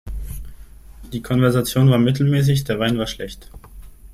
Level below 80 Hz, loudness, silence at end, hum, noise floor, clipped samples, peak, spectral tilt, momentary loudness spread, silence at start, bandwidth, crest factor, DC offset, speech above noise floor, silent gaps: -36 dBFS; -18 LUFS; 0.05 s; none; -40 dBFS; under 0.1%; -4 dBFS; -6.5 dB/octave; 18 LU; 0.05 s; 16 kHz; 16 dB; under 0.1%; 22 dB; none